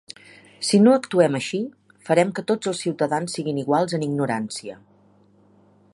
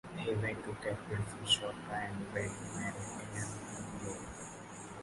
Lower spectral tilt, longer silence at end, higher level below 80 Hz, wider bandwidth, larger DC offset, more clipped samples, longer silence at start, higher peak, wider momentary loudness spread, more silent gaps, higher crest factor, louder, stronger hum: first, -5.5 dB/octave vs -3.5 dB/octave; first, 1.2 s vs 0 s; second, -70 dBFS vs -60 dBFS; about the same, 11.5 kHz vs 11.5 kHz; neither; neither; first, 0.6 s vs 0.05 s; first, -4 dBFS vs -18 dBFS; first, 16 LU vs 13 LU; neither; about the same, 20 dB vs 22 dB; first, -22 LUFS vs -39 LUFS; neither